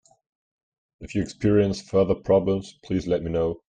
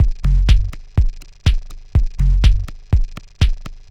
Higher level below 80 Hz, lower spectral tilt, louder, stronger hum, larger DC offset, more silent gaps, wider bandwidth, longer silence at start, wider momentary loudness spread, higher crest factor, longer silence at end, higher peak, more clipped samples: second, -48 dBFS vs -16 dBFS; first, -7.5 dB/octave vs -6 dB/octave; second, -24 LUFS vs -19 LUFS; neither; second, under 0.1% vs 0.7%; neither; first, 9.4 kHz vs 7.8 kHz; first, 1 s vs 0 s; about the same, 9 LU vs 8 LU; about the same, 16 dB vs 14 dB; about the same, 0.1 s vs 0.15 s; second, -8 dBFS vs 0 dBFS; neither